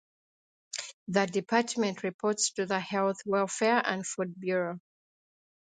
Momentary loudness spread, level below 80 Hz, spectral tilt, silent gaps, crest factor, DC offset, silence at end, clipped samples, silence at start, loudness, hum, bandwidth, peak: 11 LU; -78 dBFS; -3.5 dB/octave; 0.93-1.06 s, 2.14-2.19 s; 22 dB; under 0.1%; 1 s; under 0.1%; 0.75 s; -30 LUFS; none; 9.6 kHz; -10 dBFS